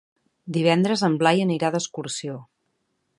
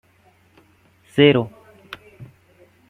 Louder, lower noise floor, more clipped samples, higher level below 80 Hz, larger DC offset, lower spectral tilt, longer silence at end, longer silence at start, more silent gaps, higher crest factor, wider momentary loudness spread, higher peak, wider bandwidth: second, -22 LUFS vs -17 LUFS; first, -73 dBFS vs -57 dBFS; neither; second, -70 dBFS vs -60 dBFS; neither; second, -5 dB/octave vs -7.5 dB/octave; about the same, 0.75 s vs 0.65 s; second, 0.45 s vs 1.15 s; neither; about the same, 20 dB vs 22 dB; second, 11 LU vs 25 LU; about the same, -4 dBFS vs -2 dBFS; about the same, 11.5 kHz vs 11 kHz